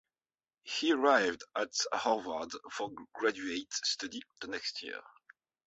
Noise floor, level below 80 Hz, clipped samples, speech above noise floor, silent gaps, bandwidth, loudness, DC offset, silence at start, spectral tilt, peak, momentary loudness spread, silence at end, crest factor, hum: under -90 dBFS; -76 dBFS; under 0.1%; over 56 dB; none; 8 kHz; -34 LUFS; under 0.1%; 0.65 s; 0 dB/octave; -12 dBFS; 14 LU; 0.65 s; 24 dB; none